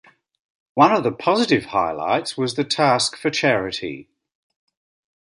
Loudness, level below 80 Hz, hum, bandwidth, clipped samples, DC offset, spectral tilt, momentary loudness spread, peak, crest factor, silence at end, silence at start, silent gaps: -20 LUFS; -58 dBFS; none; 11.5 kHz; under 0.1%; under 0.1%; -4 dB/octave; 12 LU; -2 dBFS; 20 dB; 1.2 s; 0.75 s; none